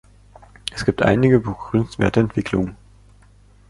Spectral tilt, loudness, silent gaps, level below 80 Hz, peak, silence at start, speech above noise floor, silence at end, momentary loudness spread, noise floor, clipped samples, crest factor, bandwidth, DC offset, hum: -7 dB/octave; -20 LUFS; none; -42 dBFS; -2 dBFS; 0.7 s; 32 dB; 0.95 s; 11 LU; -50 dBFS; under 0.1%; 18 dB; 11.5 kHz; under 0.1%; 50 Hz at -40 dBFS